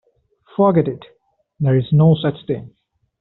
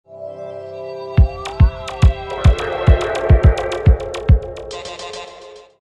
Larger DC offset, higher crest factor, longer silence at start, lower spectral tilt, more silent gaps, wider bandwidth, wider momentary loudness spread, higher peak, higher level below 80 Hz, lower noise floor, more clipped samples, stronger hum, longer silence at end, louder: neither; about the same, 16 dB vs 16 dB; first, 0.6 s vs 0.1 s; about the same, -8 dB/octave vs -7 dB/octave; neither; second, 4.1 kHz vs 9.8 kHz; second, 13 LU vs 16 LU; about the same, -2 dBFS vs 0 dBFS; second, -54 dBFS vs -18 dBFS; first, -55 dBFS vs -39 dBFS; neither; neither; first, 0.55 s vs 0.25 s; about the same, -17 LUFS vs -16 LUFS